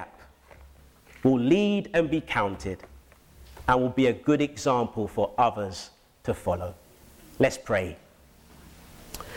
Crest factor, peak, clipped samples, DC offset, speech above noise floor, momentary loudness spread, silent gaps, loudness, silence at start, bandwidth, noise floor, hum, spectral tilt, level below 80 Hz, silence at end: 20 dB; -8 dBFS; under 0.1%; under 0.1%; 30 dB; 16 LU; none; -26 LUFS; 0 s; 17 kHz; -55 dBFS; none; -6 dB/octave; -50 dBFS; 0 s